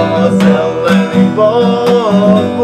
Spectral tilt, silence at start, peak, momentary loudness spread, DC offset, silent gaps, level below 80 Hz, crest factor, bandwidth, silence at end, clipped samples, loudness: -7.5 dB/octave; 0 s; 0 dBFS; 2 LU; under 0.1%; none; -48 dBFS; 10 dB; 9.6 kHz; 0 s; 0.2%; -10 LUFS